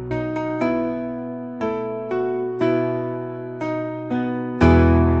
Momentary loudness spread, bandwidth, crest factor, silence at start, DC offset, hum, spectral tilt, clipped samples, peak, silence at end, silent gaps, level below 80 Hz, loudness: 13 LU; 7.4 kHz; 18 dB; 0 s; 0.1%; none; -9 dB/octave; under 0.1%; -2 dBFS; 0 s; none; -36 dBFS; -22 LUFS